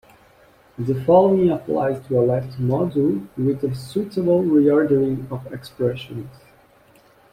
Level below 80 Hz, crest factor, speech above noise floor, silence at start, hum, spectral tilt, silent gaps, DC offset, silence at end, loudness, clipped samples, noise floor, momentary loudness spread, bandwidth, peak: -54 dBFS; 16 dB; 34 dB; 0.8 s; none; -9 dB/octave; none; under 0.1%; 1 s; -20 LUFS; under 0.1%; -53 dBFS; 16 LU; 15 kHz; -4 dBFS